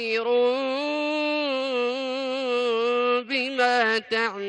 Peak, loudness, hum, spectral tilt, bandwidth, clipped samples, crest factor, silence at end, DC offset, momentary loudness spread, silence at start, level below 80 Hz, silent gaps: -8 dBFS; -24 LUFS; none; -3 dB/octave; 9.6 kHz; under 0.1%; 16 dB; 0 s; under 0.1%; 4 LU; 0 s; -76 dBFS; none